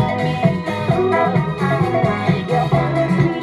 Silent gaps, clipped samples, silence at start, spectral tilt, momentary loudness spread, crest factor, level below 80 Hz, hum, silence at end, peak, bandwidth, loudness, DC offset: none; under 0.1%; 0 s; -8 dB/octave; 3 LU; 16 dB; -42 dBFS; none; 0 s; -2 dBFS; 12 kHz; -18 LUFS; under 0.1%